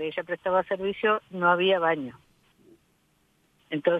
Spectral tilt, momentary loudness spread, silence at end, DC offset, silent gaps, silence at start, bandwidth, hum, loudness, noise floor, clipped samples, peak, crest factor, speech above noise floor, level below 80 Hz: -7 dB/octave; 9 LU; 0 s; under 0.1%; none; 0 s; 4.9 kHz; none; -26 LUFS; -67 dBFS; under 0.1%; -10 dBFS; 18 dB; 42 dB; -68 dBFS